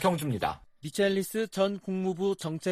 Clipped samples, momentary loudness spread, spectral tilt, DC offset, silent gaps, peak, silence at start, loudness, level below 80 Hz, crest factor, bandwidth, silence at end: under 0.1%; 6 LU; -5.5 dB/octave; under 0.1%; none; -12 dBFS; 0 s; -30 LUFS; -60 dBFS; 18 dB; 15 kHz; 0 s